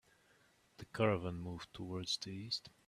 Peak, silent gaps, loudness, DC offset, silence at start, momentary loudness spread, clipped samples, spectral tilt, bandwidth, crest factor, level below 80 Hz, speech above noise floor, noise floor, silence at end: -18 dBFS; none; -40 LUFS; under 0.1%; 0.8 s; 13 LU; under 0.1%; -4.5 dB/octave; 14 kHz; 24 dB; -68 dBFS; 31 dB; -71 dBFS; 0.2 s